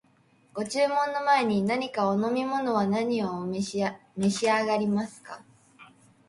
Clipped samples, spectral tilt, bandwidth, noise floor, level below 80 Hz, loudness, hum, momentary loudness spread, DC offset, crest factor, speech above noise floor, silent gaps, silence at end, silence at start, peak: under 0.1%; -5 dB/octave; 11.5 kHz; -63 dBFS; -68 dBFS; -27 LUFS; none; 12 LU; under 0.1%; 16 dB; 36 dB; none; 0.45 s; 0.55 s; -12 dBFS